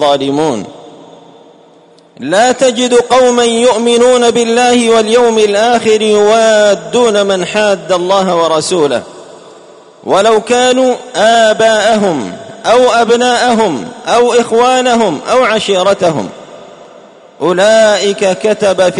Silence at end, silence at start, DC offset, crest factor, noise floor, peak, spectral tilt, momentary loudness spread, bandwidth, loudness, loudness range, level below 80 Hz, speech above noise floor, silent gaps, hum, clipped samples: 0 s; 0 s; under 0.1%; 10 dB; -42 dBFS; 0 dBFS; -3.5 dB/octave; 7 LU; 11 kHz; -9 LUFS; 4 LU; -52 dBFS; 33 dB; none; none; under 0.1%